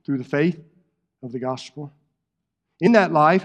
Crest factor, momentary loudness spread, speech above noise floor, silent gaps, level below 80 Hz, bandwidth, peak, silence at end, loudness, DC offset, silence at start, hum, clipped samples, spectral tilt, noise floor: 22 dB; 23 LU; 60 dB; none; -74 dBFS; 9.4 kHz; 0 dBFS; 0 s; -20 LUFS; under 0.1%; 0.1 s; none; under 0.1%; -7 dB/octave; -80 dBFS